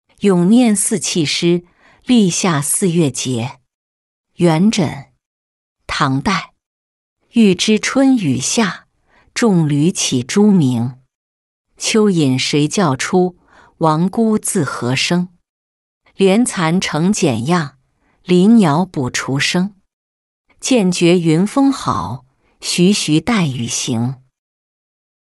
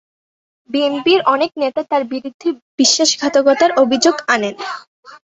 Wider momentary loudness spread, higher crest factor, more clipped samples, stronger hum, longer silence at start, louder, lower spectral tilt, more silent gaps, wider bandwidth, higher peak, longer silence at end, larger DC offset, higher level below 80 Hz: about the same, 9 LU vs 11 LU; about the same, 14 dB vs 16 dB; neither; neither; second, 0.2 s vs 0.7 s; about the same, -15 LUFS vs -15 LUFS; first, -5 dB/octave vs -1.5 dB/octave; first, 3.74-4.24 s, 5.26-5.76 s, 6.66-7.16 s, 11.15-11.65 s, 15.49-16.01 s, 19.93-20.45 s vs 2.34-2.40 s, 2.62-2.78 s, 4.87-5.03 s; first, 12.5 kHz vs 8.4 kHz; about the same, -2 dBFS vs 0 dBFS; first, 1.15 s vs 0.25 s; neither; first, -50 dBFS vs -64 dBFS